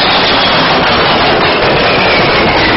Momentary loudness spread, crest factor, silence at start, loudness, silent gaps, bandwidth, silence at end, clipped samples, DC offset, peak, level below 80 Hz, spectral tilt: 1 LU; 8 dB; 0 s; -8 LUFS; none; 6 kHz; 0 s; under 0.1%; under 0.1%; 0 dBFS; -30 dBFS; -1.5 dB/octave